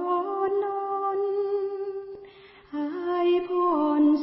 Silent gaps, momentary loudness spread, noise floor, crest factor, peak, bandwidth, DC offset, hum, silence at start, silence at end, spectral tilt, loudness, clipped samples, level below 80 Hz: none; 13 LU; -49 dBFS; 14 dB; -12 dBFS; 5.8 kHz; under 0.1%; none; 0 s; 0 s; -9 dB/octave; -26 LUFS; under 0.1%; -70 dBFS